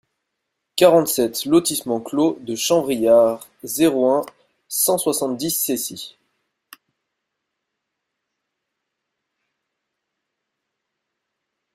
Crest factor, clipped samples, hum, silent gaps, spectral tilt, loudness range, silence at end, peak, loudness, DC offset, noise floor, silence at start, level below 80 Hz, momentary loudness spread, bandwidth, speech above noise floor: 22 dB; under 0.1%; none; none; -3.5 dB/octave; 10 LU; 5.65 s; -2 dBFS; -19 LUFS; under 0.1%; -79 dBFS; 0.75 s; -64 dBFS; 14 LU; 16 kHz; 61 dB